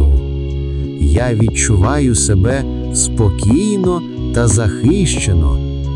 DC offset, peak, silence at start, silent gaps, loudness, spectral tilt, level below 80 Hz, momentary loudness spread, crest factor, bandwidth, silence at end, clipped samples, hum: under 0.1%; 0 dBFS; 0 s; none; -14 LUFS; -5.5 dB/octave; -20 dBFS; 7 LU; 12 dB; 11 kHz; 0 s; under 0.1%; none